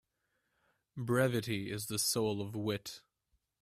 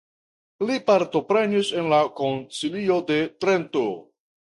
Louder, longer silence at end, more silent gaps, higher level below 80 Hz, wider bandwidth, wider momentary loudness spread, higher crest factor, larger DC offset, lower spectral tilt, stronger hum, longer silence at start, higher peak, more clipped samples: second, -35 LUFS vs -23 LUFS; first, 0.65 s vs 0.5 s; neither; about the same, -68 dBFS vs -64 dBFS; first, 16 kHz vs 11.5 kHz; first, 15 LU vs 8 LU; about the same, 20 dB vs 18 dB; neither; about the same, -4 dB/octave vs -5 dB/octave; neither; first, 0.95 s vs 0.6 s; second, -16 dBFS vs -6 dBFS; neither